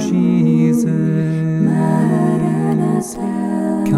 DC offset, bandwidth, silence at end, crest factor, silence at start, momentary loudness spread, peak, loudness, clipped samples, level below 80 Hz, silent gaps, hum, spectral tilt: under 0.1%; 12.5 kHz; 0 s; 10 dB; 0 s; 6 LU; -4 dBFS; -16 LUFS; under 0.1%; -48 dBFS; none; none; -8 dB/octave